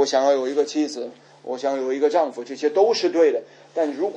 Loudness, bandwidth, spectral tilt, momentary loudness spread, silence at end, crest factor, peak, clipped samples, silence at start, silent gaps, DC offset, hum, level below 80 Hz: -22 LUFS; 9.4 kHz; -3 dB/octave; 13 LU; 0 s; 16 dB; -6 dBFS; under 0.1%; 0 s; none; under 0.1%; none; -84 dBFS